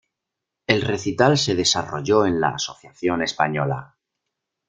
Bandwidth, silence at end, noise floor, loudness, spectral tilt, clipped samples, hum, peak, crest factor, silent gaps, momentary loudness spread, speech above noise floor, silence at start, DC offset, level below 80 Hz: 9.6 kHz; 0.85 s; -83 dBFS; -21 LUFS; -4 dB/octave; under 0.1%; none; -2 dBFS; 20 dB; none; 10 LU; 62 dB; 0.7 s; under 0.1%; -56 dBFS